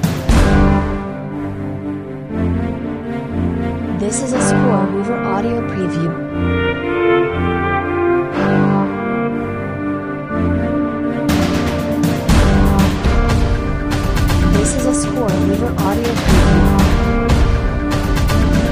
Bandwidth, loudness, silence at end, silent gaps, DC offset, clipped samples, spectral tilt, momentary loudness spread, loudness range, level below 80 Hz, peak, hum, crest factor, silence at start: 15.5 kHz; -16 LUFS; 0 s; none; under 0.1%; under 0.1%; -6 dB/octave; 9 LU; 4 LU; -22 dBFS; 0 dBFS; none; 14 dB; 0 s